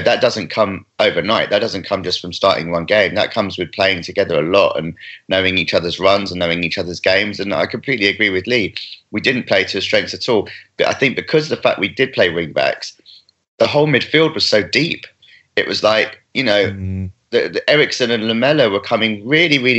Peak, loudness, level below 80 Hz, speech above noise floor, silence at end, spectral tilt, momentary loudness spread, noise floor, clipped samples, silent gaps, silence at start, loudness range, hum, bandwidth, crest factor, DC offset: 0 dBFS; -16 LUFS; -58 dBFS; 30 dB; 0 s; -4.5 dB/octave; 7 LU; -47 dBFS; under 0.1%; 13.48-13.58 s; 0 s; 1 LU; none; 8.2 kHz; 16 dB; under 0.1%